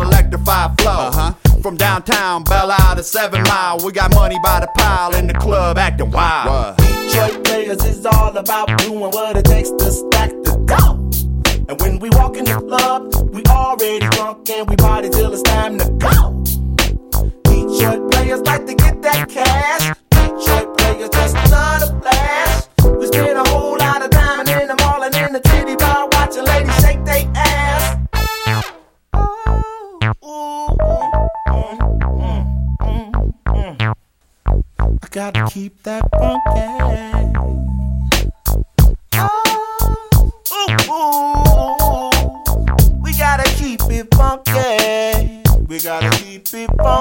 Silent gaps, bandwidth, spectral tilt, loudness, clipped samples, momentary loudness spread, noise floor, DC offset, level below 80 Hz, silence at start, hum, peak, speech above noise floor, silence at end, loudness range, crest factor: none; 17 kHz; -4.5 dB/octave; -15 LUFS; under 0.1%; 7 LU; -55 dBFS; under 0.1%; -18 dBFS; 0 s; none; 0 dBFS; 42 dB; 0 s; 5 LU; 14 dB